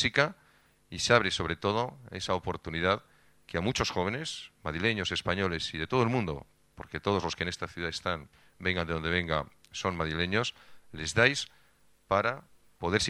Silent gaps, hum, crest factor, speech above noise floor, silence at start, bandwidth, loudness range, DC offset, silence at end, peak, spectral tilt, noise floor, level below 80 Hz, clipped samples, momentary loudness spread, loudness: none; none; 26 dB; 33 dB; 0 s; 13 kHz; 3 LU; under 0.1%; 0 s; -6 dBFS; -4 dB/octave; -63 dBFS; -52 dBFS; under 0.1%; 13 LU; -30 LUFS